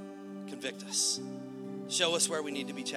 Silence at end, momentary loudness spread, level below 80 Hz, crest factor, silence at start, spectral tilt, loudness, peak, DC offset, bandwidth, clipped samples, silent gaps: 0 s; 15 LU; -86 dBFS; 22 dB; 0 s; -1.5 dB/octave; -32 LUFS; -14 dBFS; under 0.1%; 16.5 kHz; under 0.1%; none